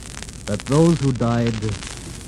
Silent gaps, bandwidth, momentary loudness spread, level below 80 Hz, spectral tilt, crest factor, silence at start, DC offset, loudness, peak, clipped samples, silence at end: none; 12.5 kHz; 15 LU; -38 dBFS; -6.5 dB/octave; 16 dB; 0 s; under 0.1%; -20 LUFS; -4 dBFS; under 0.1%; 0 s